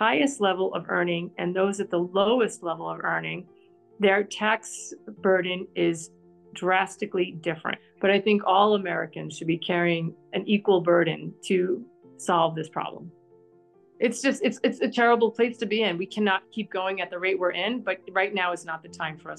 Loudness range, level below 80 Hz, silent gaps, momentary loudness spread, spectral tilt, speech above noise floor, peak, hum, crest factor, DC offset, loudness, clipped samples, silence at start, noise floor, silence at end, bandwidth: 3 LU; -76 dBFS; none; 12 LU; -4.5 dB/octave; 32 dB; -8 dBFS; none; 18 dB; under 0.1%; -25 LUFS; under 0.1%; 0 s; -58 dBFS; 0 s; 12 kHz